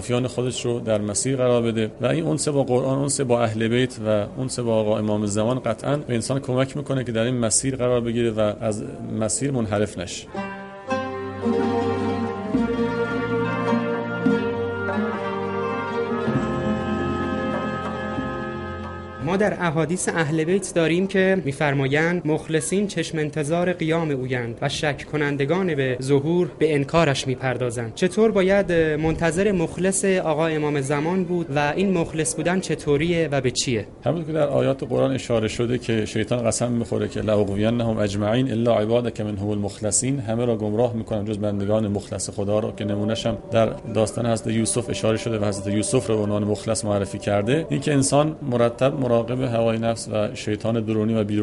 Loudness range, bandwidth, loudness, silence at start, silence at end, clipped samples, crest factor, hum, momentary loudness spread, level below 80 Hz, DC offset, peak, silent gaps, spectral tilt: 4 LU; 11.5 kHz; -23 LUFS; 0 s; 0 s; under 0.1%; 18 dB; none; 6 LU; -48 dBFS; under 0.1%; -4 dBFS; none; -5.5 dB/octave